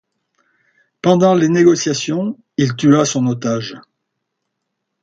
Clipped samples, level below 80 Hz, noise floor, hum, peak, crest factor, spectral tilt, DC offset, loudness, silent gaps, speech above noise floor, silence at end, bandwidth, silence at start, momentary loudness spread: under 0.1%; -60 dBFS; -75 dBFS; none; 0 dBFS; 16 dB; -5.5 dB/octave; under 0.1%; -15 LUFS; none; 61 dB; 1.2 s; 9 kHz; 1.05 s; 10 LU